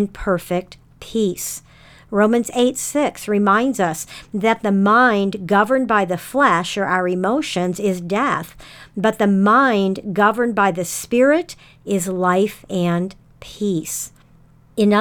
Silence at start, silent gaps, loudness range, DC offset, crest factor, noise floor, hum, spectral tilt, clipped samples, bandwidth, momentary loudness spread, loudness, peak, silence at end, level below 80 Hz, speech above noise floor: 0 s; none; 4 LU; under 0.1%; 16 dB; -50 dBFS; none; -5 dB/octave; under 0.1%; 19 kHz; 12 LU; -18 LUFS; -2 dBFS; 0 s; -50 dBFS; 32 dB